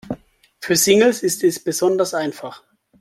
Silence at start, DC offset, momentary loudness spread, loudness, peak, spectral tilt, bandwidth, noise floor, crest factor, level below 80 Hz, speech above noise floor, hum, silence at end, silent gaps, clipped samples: 0.05 s; under 0.1%; 20 LU; -17 LUFS; 0 dBFS; -3 dB/octave; 16 kHz; -44 dBFS; 18 dB; -58 dBFS; 26 dB; none; 0.45 s; none; under 0.1%